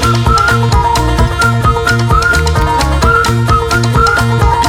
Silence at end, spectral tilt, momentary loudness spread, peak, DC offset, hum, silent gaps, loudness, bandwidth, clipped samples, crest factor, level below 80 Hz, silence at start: 0 s; -5 dB/octave; 2 LU; 0 dBFS; under 0.1%; none; none; -10 LUFS; 16.5 kHz; under 0.1%; 10 dB; -16 dBFS; 0 s